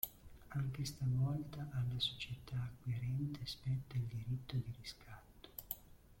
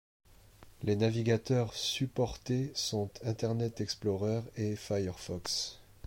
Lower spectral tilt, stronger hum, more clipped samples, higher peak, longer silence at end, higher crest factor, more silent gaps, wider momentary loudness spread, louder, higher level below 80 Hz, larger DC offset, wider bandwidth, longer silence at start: about the same, -5.5 dB/octave vs -5 dB/octave; neither; neither; second, -20 dBFS vs -16 dBFS; second, 0.05 s vs 0.25 s; first, 24 dB vs 18 dB; neither; first, 14 LU vs 7 LU; second, -42 LUFS vs -34 LUFS; about the same, -60 dBFS vs -58 dBFS; neither; about the same, 16.5 kHz vs 16.5 kHz; second, 0.05 s vs 0.6 s